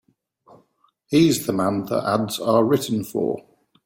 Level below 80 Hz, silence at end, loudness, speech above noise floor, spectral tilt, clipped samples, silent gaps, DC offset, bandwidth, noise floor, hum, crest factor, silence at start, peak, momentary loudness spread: -60 dBFS; 0.45 s; -21 LUFS; 43 dB; -5.5 dB/octave; under 0.1%; none; under 0.1%; 17 kHz; -64 dBFS; none; 16 dB; 1.1 s; -6 dBFS; 7 LU